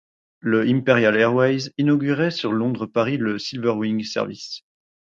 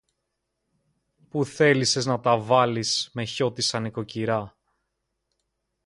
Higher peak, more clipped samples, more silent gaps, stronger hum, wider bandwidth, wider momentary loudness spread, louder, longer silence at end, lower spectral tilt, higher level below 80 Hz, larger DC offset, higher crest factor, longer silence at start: about the same, -2 dBFS vs -4 dBFS; neither; neither; neither; second, 7.6 kHz vs 11.5 kHz; about the same, 11 LU vs 10 LU; first, -21 LUFS vs -24 LUFS; second, 0.5 s vs 1.35 s; first, -6.5 dB/octave vs -4 dB/octave; about the same, -64 dBFS vs -64 dBFS; neither; about the same, 20 dB vs 22 dB; second, 0.45 s vs 1.35 s